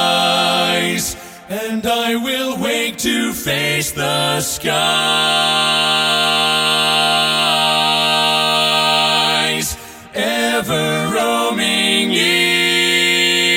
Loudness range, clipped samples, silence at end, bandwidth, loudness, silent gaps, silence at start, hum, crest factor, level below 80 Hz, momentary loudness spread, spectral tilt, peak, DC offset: 5 LU; under 0.1%; 0 s; 17 kHz; -14 LUFS; none; 0 s; none; 14 dB; -48 dBFS; 7 LU; -2 dB/octave; -2 dBFS; under 0.1%